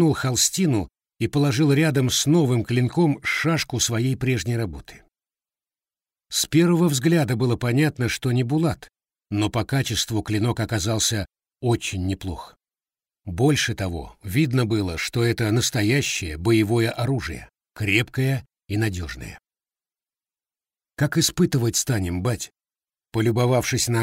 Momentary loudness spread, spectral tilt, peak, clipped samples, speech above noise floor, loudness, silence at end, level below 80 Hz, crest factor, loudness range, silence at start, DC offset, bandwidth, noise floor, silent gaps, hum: 12 LU; -4.5 dB/octave; -4 dBFS; under 0.1%; over 68 dB; -22 LUFS; 0 s; -46 dBFS; 18 dB; 5 LU; 0 s; under 0.1%; 16 kHz; under -90 dBFS; none; none